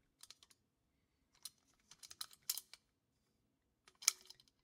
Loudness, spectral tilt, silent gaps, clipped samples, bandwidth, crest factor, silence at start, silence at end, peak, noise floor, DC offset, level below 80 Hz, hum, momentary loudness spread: -41 LUFS; 3.5 dB/octave; none; under 0.1%; 16.5 kHz; 42 dB; 1.45 s; 0.3 s; -8 dBFS; -83 dBFS; under 0.1%; -88 dBFS; none; 25 LU